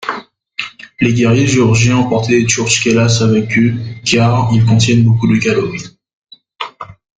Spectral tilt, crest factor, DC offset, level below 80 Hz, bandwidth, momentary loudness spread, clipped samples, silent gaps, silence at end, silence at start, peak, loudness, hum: -5 dB/octave; 12 dB; under 0.1%; -42 dBFS; 9.4 kHz; 16 LU; under 0.1%; 6.13-6.22 s; 0.25 s; 0 s; 0 dBFS; -12 LUFS; none